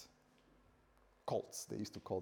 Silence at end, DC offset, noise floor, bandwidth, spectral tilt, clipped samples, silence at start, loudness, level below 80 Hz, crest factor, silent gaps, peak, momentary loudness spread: 0 s; under 0.1%; -71 dBFS; over 20 kHz; -5 dB/octave; under 0.1%; 0 s; -45 LUFS; -76 dBFS; 20 dB; none; -26 dBFS; 9 LU